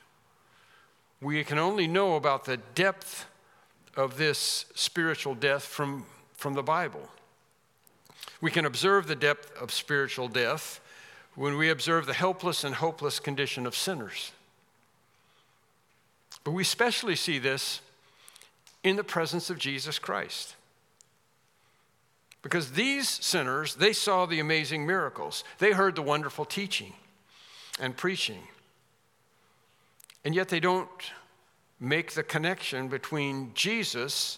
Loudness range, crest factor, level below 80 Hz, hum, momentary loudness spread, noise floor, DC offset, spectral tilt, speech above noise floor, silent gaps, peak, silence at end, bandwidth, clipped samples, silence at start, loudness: 7 LU; 24 dB; -84 dBFS; none; 14 LU; -69 dBFS; under 0.1%; -3.5 dB/octave; 40 dB; none; -8 dBFS; 0 s; 17 kHz; under 0.1%; 1.2 s; -29 LUFS